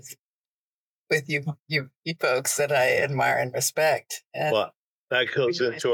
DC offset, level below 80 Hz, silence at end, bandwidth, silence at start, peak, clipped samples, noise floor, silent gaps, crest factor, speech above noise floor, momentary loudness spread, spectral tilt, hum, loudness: under 0.1%; -74 dBFS; 0 s; 19 kHz; 0.05 s; -10 dBFS; under 0.1%; under -90 dBFS; 0.19-1.06 s, 1.60-1.66 s, 1.96-2.03 s, 4.26-4.31 s, 4.76-5.08 s; 16 dB; over 65 dB; 7 LU; -3 dB/octave; none; -25 LUFS